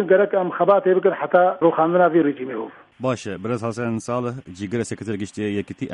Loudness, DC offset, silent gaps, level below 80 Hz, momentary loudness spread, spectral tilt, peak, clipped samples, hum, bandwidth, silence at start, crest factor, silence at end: -21 LUFS; under 0.1%; none; -64 dBFS; 12 LU; -6.5 dB/octave; -2 dBFS; under 0.1%; none; 11 kHz; 0 s; 18 dB; 0 s